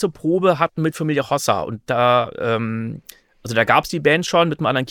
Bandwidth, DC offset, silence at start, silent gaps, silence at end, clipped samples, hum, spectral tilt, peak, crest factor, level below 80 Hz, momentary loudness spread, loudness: 19.5 kHz; under 0.1%; 0 s; none; 0 s; under 0.1%; none; -5 dB/octave; -2 dBFS; 18 dB; -54 dBFS; 8 LU; -19 LUFS